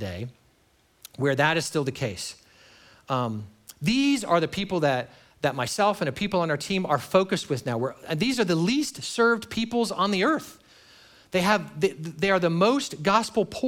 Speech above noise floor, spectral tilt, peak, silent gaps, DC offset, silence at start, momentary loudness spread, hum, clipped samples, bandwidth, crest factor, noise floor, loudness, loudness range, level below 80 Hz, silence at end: 39 dB; -5 dB/octave; -6 dBFS; none; under 0.1%; 0 s; 8 LU; none; under 0.1%; 18.5 kHz; 20 dB; -63 dBFS; -25 LUFS; 3 LU; -60 dBFS; 0 s